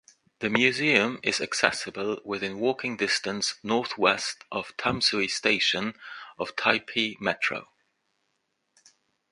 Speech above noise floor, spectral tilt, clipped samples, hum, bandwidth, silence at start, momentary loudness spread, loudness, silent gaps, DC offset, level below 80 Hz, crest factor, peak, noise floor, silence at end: 50 dB; -2.5 dB/octave; under 0.1%; none; 11.5 kHz; 0.4 s; 11 LU; -26 LUFS; none; under 0.1%; -64 dBFS; 26 dB; -2 dBFS; -77 dBFS; 1.65 s